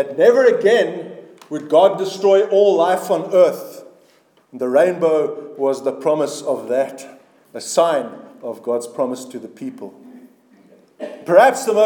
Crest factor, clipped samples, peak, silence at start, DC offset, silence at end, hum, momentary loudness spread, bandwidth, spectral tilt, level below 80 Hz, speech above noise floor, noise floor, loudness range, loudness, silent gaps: 18 dB; under 0.1%; 0 dBFS; 0 s; under 0.1%; 0 s; none; 20 LU; 19 kHz; -4.5 dB/octave; -80 dBFS; 39 dB; -55 dBFS; 8 LU; -17 LUFS; none